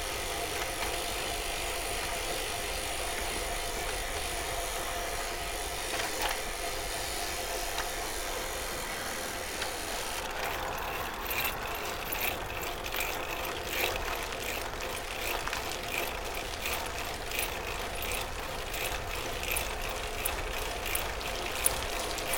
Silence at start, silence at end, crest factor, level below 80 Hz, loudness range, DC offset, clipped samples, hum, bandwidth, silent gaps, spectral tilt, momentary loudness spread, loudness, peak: 0 s; 0 s; 28 dB; -44 dBFS; 1 LU; under 0.1%; under 0.1%; none; 17 kHz; none; -2 dB/octave; 4 LU; -33 LUFS; -8 dBFS